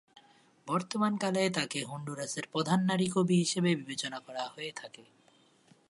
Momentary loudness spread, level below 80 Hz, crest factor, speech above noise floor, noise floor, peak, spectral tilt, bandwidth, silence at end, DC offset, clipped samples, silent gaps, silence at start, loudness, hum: 13 LU; -76 dBFS; 20 dB; 33 dB; -65 dBFS; -12 dBFS; -5 dB/octave; 11.5 kHz; 0.85 s; under 0.1%; under 0.1%; none; 0.65 s; -32 LUFS; none